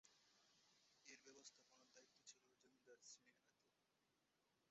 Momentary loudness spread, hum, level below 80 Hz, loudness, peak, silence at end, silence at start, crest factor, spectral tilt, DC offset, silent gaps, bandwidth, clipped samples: 3 LU; none; under -90 dBFS; -66 LUFS; -48 dBFS; 0 s; 0.05 s; 24 dB; -0.5 dB/octave; under 0.1%; none; 7.6 kHz; under 0.1%